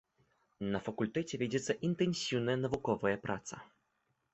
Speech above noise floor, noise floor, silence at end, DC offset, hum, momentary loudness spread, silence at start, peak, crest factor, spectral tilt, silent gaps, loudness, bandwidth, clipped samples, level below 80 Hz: 45 dB; -80 dBFS; 0.7 s; under 0.1%; none; 8 LU; 0.6 s; -18 dBFS; 18 dB; -5.5 dB/octave; none; -36 LUFS; 8.2 kHz; under 0.1%; -66 dBFS